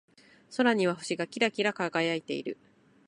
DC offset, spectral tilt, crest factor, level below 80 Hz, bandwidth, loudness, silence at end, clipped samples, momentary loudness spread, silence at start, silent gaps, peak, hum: under 0.1%; -4.5 dB/octave; 20 dB; -78 dBFS; 11.5 kHz; -29 LUFS; 0.55 s; under 0.1%; 12 LU; 0.5 s; none; -10 dBFS; none